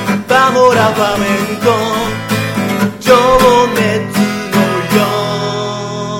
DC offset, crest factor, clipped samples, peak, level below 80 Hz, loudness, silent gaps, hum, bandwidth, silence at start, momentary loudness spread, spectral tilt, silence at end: 0.3%; 12 dB; under 0.1%; 0 dBFS; -36 dBFS; -12 LUFS; none; none; 17.5 kHz; 0 s; 8 LU; -5 dB/octave; 0 s